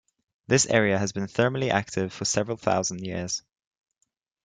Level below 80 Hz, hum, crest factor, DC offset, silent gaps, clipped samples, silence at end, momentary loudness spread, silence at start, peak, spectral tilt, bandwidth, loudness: -62 dBFS; none; 22 dB; under 0.1%; none; under 0.1%; 1.05 s; 9 LU; 0.5 s; -6 dBFS; -4 dB/octave; 10.5 kHz; -25 LUFS